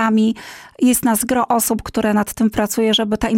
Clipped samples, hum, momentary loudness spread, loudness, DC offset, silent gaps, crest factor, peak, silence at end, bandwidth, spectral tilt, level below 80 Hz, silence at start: under 0.1%; none; 4 LU; -17 LUFS; under 0.1%; none; 12 dB; -4 dBFS; 0 s; 17 kHz; -3.5 dB/octave; -42 dBFS; 0 s